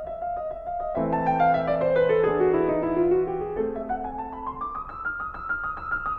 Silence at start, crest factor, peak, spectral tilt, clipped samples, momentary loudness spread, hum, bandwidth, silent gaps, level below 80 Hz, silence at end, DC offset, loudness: 0 s; 14 dB; -10 dBFS; -9.5 dB/octave; under 0.1%; 11 LU; none; 5 kHz; none; -46 dBFS; 0 s; under 0.1%; -26 LUFS